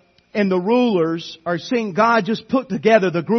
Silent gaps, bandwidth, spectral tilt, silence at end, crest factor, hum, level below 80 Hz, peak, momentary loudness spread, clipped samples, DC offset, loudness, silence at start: none; 6.4 kHz; -6.5 dB/octave; 0 s; 16 dB; none; -64 dBFS; -2 dBFS; 10 LU; under 0.1%; under 0.1%; -19 LUFS; 0.35 s